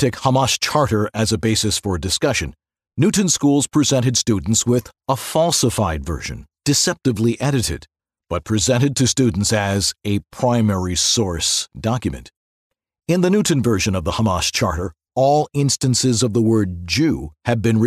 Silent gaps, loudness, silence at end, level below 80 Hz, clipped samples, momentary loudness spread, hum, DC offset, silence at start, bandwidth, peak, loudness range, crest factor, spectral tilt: 12.36-12.70 s; -18 LUFS; 0 s; -40 dBFS; under 0.1%; 8 LU; none; under 0.1%; 0 s; 13.5 kHz; -2 dBFS; 2 LU; 16 dB; -4.5 dB/octave